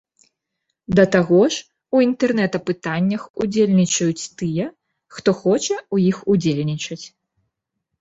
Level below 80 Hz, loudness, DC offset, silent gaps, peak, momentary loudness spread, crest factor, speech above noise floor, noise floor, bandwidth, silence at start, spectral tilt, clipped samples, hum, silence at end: -54 dBFS; -19 LUFS; under 0.1%; 3.30-3.34 s; -2 dBFS; 11 LU; 18 dB; 60 dB; -78 dBFS; 8 kHz; 0.9 s; -5.5 dB/octave; under 0.1%; none; 0.95 s